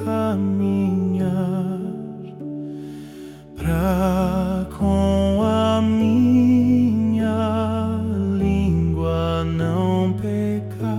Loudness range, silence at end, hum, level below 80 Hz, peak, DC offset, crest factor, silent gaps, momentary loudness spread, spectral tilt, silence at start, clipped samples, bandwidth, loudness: 6 LU; 0 s; none; -38 dBFS; -8 dBFS; under 0.1%; 12 dB; none; 15 LU; -8 dB/octave; 0 s; under 0.1%; 14 kHz; -20 LUFS